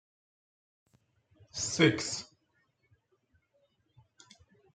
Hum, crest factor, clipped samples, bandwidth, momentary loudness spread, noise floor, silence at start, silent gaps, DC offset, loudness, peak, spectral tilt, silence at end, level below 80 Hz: none; 26 dB; under 0.1%; 9.4 kHz; 14 LU; -75 dBFS; 1.55 s; none; under 0.1%; -30 LUFS; -12 dBFS; -4 dB/octave; 2.5 s; -72 dBFS